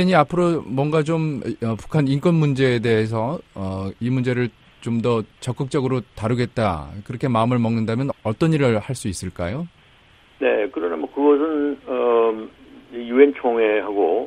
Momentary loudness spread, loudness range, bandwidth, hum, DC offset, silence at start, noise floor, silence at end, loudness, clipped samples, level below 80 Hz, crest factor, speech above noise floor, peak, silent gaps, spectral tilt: 10 LU; 4 LU; 12.5 kHz; none; under 0.1%; 0 s; -52 dBFS; 0 s; -21 LUFS; under 0.1%; -50 dBFS; 20 dB; 32 dB; -2 dBFS; none; -7 dB/octave